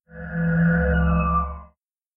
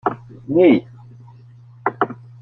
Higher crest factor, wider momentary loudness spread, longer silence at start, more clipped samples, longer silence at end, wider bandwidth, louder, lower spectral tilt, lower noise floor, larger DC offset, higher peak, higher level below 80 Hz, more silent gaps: about the same, 14 dB vs 18 dB; about the same, 13 LU vs 13 LU; about the same, 0.15 s vs 0.05 s; neither; first, 0.5 s vs 0.3 s; second, 3.1 kHz vs 4.2 kHz; second, -22 LUFS vs -18 LUFS; first, -13 dB/octave vs -9.5 dB/octave; first, -61 dBFS vs -44 dBFS; neither; second, -10 dBFS vs -2 dBFS; first, -30 dBFS vs -60 dBFS; neither